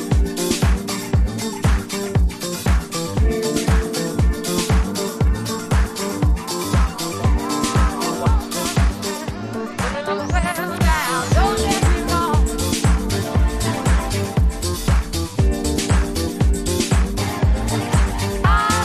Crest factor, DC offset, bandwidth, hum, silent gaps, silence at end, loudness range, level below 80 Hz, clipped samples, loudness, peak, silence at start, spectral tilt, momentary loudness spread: 14 dB; under 0.1%; 14.5 kHz; none; none; 0 s; 2 LU; -22 dBFS; under 0.1%; -20 LUFS; -4 dBFS; 0 s; -5 dB/octave; 5 LU